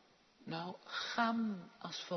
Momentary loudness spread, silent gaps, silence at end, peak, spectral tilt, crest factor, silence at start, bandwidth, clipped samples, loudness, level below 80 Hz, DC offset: 11 LU; none; 0 s; -20 dBFS; -3 dB/octave; 22 dB; 0.4 s; 6.2 kHz; under 0.1%; -40 LUFS; -86 dBFS; under 0.1%